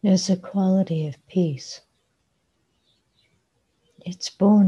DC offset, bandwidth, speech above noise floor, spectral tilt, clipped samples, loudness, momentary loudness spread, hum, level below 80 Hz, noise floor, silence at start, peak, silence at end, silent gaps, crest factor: under 0.1%; 9.6 kHz; 50 dB; -7 dB/octave; under 0.1%; -23 LUFS; 17 LU; none; -66 dBFS; -71 dBFS; 0.05 s; -6 dBFS; 0 s; none; 18 dB